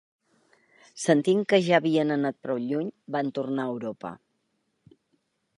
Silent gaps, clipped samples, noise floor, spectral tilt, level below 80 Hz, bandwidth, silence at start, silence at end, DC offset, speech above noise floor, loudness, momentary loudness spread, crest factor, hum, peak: none; under 0.1%; -75 dBFS; -5.5 dB/octave; -76 dBFS; 11.5 kHz; 0.95 s; 1.4 s; under 0.1%; 50 dB; -26 LUFS; 12 LU; 20 dB; none; -8 dBFS